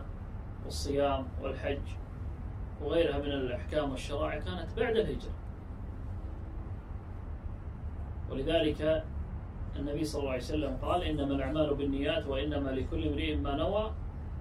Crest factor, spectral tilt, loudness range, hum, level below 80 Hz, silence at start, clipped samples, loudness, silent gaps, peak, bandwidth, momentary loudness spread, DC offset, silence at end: 18 dB; -6.5 dB/octave; 5 LU; none; -40 dBFS; 0 s; under 0.1%; -35 LUFS; none; -16 dBFS; 13 kHz; 13 LU; under 0.1%; 0 s